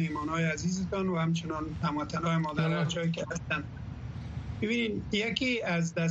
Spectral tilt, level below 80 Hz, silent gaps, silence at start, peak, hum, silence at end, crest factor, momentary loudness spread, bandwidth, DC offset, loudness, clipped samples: -5.5 dB/octave; -50 dBFS; none; 0 s; -12 dBFS; none; 0 s; 18 dB; 10 LU; 8 kHz; under 0.1%; -31 LUFS; under 0.1%